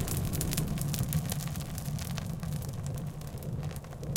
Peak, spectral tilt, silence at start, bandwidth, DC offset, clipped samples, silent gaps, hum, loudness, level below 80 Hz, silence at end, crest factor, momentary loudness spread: -8 dBFS; -5 dB/octave; 0 s; 17 kHz; under 0.1%; under 0.1%; none; none; -35 LUFS; -44 dBFS; 0 s; 26 dB; 7 LU